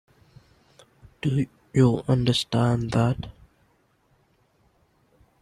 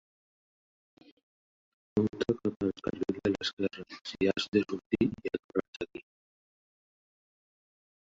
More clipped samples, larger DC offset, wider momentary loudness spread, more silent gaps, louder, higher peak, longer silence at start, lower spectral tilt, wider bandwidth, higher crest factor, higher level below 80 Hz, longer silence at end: neither; neither; second, 9 LU vs 12 LU; second, none vs 2.56-2.60 s, 3.53-3.57 s, 4.01-4.05 s, 4.48-4.52 s, 4.86-4.90 s, 5.44-5.49 s, 5.68-5.73 s; first, -24 LUFS vs -33 LUFS; first, -6 dBFS vs -12 dBFS; second, 1.25 s vs 1.95 s; about the same, -6.5 dB/octave vs -6 dB/octave; first, 12 kHz vs 7.8 kHz; about the same, 20 dB vs 22 dB; first, -52 dBFS vs -62 dBFS; about the same, 2.1 s vs 2 s